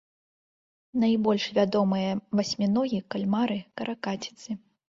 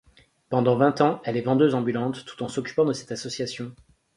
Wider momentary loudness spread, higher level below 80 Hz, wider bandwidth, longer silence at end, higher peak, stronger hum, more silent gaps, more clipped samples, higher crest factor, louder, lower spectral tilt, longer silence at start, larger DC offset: about the same, 11 LU vs 12 LU; about the same, -66 dBFS vs -64 dBFS; second, 7.6 kHz vs 11.5 kHz; about the same, 0.35 s vs 0.45 s; second, -12 dBFS vs -6 dBFS; neither; neither; neither; about the same, 16 dB vs 20 dB; second, -27 LUFS vs -24 LUFS; about the same, -6 dB/octave vs -6 dB/octave; first, 0.95 s vs 0.5 s; neither